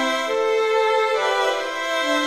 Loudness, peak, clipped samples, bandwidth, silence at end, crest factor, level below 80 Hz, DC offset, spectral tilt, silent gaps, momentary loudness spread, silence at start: -20 LUFS; -8 dBFS; under 0.1%; 14 kHz; 0 s; 12 dB; -68 dBFS; under 0.1%; -0.5 dB/octave; none; 4 LU; 0 s